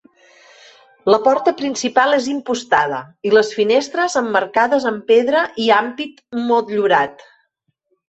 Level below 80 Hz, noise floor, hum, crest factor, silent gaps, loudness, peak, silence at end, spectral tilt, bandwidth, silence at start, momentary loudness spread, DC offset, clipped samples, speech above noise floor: -64 dBFS; -69 dBFS; none; 16 dB; none; -17 LUFS; 0 dBFS; 0.95 s; -3.5 dB/octave; 8.2 kHz; 1.05 s; 9 LU; under 0.1%; under 0.1%; 53 dB